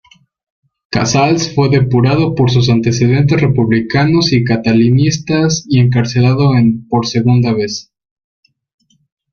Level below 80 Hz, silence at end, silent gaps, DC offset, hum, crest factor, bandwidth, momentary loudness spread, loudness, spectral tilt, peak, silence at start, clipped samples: -42 dBFS; 1.5 s; none; under 0.1%; none; 12 dB; 7.2 kHz; 4 LU; -12 LUFS; -6 dB/octave; 0 dBFS; 0.9 s; under 0.1%